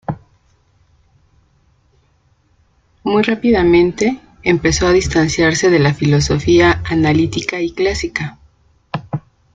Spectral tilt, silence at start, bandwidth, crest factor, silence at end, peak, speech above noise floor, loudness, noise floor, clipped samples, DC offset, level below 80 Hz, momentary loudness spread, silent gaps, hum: -5.5 dB/octave; 0.1 s; 9.2 kHz; 16 dB; 0.35 s; 0 dBFS; 43 dB; -14 LUFS; -57 dBFS; under 0.1%; under 0.1%; -36 dBFS; 16 LU; none; none